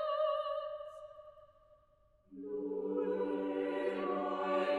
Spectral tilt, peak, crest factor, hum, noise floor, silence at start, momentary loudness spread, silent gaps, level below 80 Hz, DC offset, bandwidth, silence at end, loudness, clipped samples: -6.5 dB/octave; -22 dBFS; 14 dB; none; -69 dBFS; 0 s; 18 LU; none; -74 dBFS; under 0.1%; 9.8 kHz; 0 s; -37 LUFS; under 0.1%